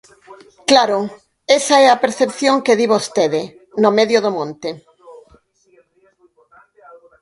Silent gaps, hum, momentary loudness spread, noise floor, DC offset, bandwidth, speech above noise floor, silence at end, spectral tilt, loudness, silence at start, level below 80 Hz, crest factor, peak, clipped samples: none; none; 16 LU; -56 dBFS; under 0.1%; 11.5 kHz; 41 dB; 2.1 s; -3 dB/octave; -15 LUFS; 0.3 s; -64 dBFS; 18 dB; 0 dBFS; under 0.1%